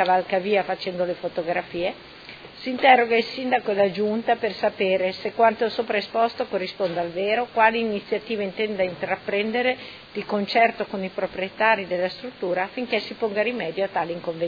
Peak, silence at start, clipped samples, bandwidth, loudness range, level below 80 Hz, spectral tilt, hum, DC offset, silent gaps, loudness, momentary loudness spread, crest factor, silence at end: -2 dBFS; 0 s; under 0.1%; 5 kHz; 3 LU; -62 dBFS; -6.5 dB/octave; none; under 0.1%; none; -23 LUFS; 9 LU; 22 dB; 0 s